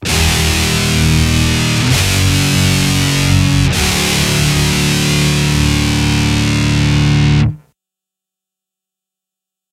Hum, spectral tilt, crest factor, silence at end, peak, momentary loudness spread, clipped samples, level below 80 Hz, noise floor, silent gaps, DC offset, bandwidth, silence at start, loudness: none; -4 dB/octave; 14 dB; 2.15 s; 0 dBFS; 2 LU; under 0.1%; -24 dBFS; -84 dBFS; none; under 0.1%; 16 kHz; 0 s; -12 LUFS